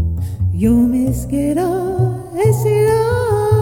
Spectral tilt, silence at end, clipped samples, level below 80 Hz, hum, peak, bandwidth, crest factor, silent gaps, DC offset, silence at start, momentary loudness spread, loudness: -8 dB/octave; 0 s; under 0.1%; -30 dBFS; none; -2 dBFS; 17 kHz; 12 dB; none; under 0.1%; 0 s; 6 LU; -16 LUFS